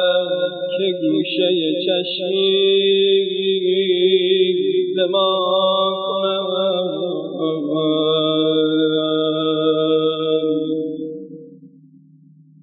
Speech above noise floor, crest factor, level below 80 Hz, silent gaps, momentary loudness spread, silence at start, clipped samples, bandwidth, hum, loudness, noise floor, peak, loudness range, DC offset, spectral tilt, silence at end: 31 dB; 14 dB; under -90 dBFS; none; 7 LU; 0 s; under 0.1%; 4.6 kHz; none; -18 LUFS; -48 dBFS; -4 dBFS; 3 LU; under 0.1%; -10.5 dB/octave; 0.95 s